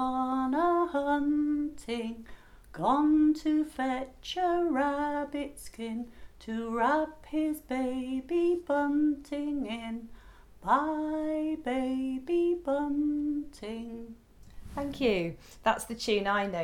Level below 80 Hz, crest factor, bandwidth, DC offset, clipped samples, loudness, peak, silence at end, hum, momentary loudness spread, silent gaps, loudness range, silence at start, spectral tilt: -54 dBFS; 20 dB; 14 kHz; under 0.1%; under 0.1%; -30 LUFS; -10 dBFS; 0 s; none; 13 LU; none; 4 LU; 0 s; -5 dB/octave